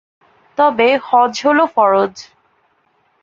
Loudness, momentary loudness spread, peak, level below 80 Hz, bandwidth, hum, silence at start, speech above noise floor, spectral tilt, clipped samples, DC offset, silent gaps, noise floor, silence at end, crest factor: -14 LUFS; 5 LU; -2 dBFS; -62 dBFS; 7.6 kHz; none; 0.6 s; 47 dB; -4 dB/octave; under 0.1%; under 0.1%; none; -60 dBFS; 1 s; 14 dB